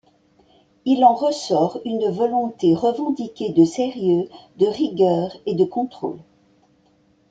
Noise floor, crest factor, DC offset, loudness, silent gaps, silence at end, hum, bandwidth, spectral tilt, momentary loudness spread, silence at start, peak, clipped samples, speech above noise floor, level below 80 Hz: -59 dBFS; 18 dB; under 0.1%; -20 LUFS; none; 1.1 s; none; 9 kHz; -7 dB/octave; 11 LU; 0.85 s; -2 dBFS; under 0.1%; 40 dB; -64 dBFS